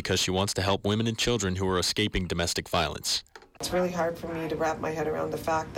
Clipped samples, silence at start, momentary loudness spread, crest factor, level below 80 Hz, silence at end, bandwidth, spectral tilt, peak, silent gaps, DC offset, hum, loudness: under 0.1%; 0 s; 5 LU; 14 dB; -48 dBFS; 0 s; 17 kHz; -4 dB/octave; -16 dBFS; none; under 0.1%; none; -28 LUFS